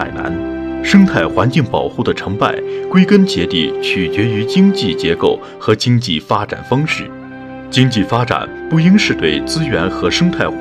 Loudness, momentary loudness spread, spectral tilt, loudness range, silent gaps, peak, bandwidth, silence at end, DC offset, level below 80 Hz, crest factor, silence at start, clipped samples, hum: -14 LUFS; 10 LU; -6 dB/octave; 2 LU; none; 0 dBFS; 11.5 kHz; 0 s; under 0.1%; -40 dBFS; 14 dB; 0 s; 0.2%; none